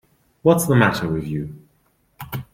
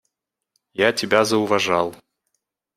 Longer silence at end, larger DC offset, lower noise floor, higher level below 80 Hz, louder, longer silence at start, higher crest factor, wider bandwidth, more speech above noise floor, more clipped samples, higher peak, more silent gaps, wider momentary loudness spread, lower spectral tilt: second, 0.1 s vs 0.8 s; neither; second, -63 dBFS vs -77 dBFS; first, -50 dBFS vs -64 dBFS; about the same, -19 LUFS vs -19 LUFS; second, 0.45 s vs 0.8 s; about the same, 20 dB vs 22 dB; about the same, 16.5 kHz vs 15.5 kHz; second, 45 dB vs 57 dB; neither; about the same, -2 dBFS vs -2 dBFS; neither; first, 18 LU vs 8 LU; first, -6 dB/octave vs -3.5 dB/octave